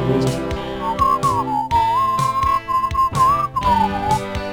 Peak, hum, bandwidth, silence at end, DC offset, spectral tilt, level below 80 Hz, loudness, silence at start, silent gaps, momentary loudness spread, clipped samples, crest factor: -6 dBFS; none; over 20 kHz; 0 s; 0.4%; -5.5 dB/octave; -34 dBFS; -18 LUFS; 0 s; none; 5 LU; under 0.1%; 14 dB